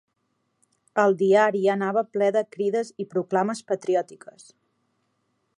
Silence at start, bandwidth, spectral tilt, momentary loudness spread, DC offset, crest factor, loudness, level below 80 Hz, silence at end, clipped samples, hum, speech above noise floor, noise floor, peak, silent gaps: 0.95 s; 11 kHz; -6 dB/octave; 10 LU; under 0.1%; 18 dB; -23 LUFS; -80 dBFS; 1.4 s; under 0.1%; none; 51 dB; -74 dBFS; -6 dBFS; none